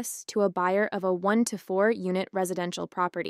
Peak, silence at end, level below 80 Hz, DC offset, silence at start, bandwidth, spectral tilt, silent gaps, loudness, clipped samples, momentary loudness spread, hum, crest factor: -12 dBFS; 0 s; -78 dBFS; under 0.1%; 0 s; 15.5 kHz; -5 dB/octave; none; -27 LUFS; under 0.1%; 5 LU; none; 16 dB